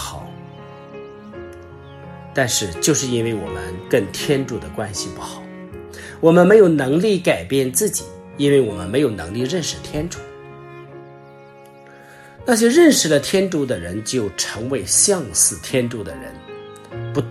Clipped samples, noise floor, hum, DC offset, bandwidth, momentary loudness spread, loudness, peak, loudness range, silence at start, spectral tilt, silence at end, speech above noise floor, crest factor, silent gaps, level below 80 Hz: under 0.1%; -43 dBFS; none; under 0.1%; 14.5 kHz; 24 LU; -18 LUFS; -2 dBFS; 8 LU; 0 s; -4 dB/octave; 0 s; 25 dB; 18 dB; none; -48 dBFS